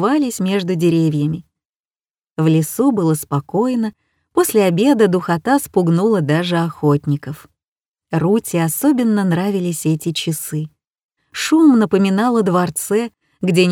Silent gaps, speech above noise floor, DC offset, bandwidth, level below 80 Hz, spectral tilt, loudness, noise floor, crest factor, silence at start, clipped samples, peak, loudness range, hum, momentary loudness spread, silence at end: 1.69-1.73 s, 1.80-1.84 s, 7.68-7.76 s, 7.88-7.92 s, 11.03-11.09 s; over 74 dB; under 0.1%; 18 kHz; -58 dBFS; -6 dB/octave; -17 LUFS; under -90 dBFS; 16 dB; 0 s; under 0.1%; -2 dBFS; 3 LU; none; 10 LU; 0 s